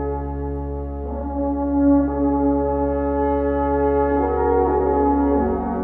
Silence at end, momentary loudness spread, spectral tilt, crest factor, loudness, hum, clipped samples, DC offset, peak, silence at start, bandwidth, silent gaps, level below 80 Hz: 0 s; 9 LU; -12.5 dB/octave; 12 dB; -20 LUFS; none; under 0.1%; 0.1%; -6 dBFS; 0 s; 3.2 kHz; none; -30 dBFS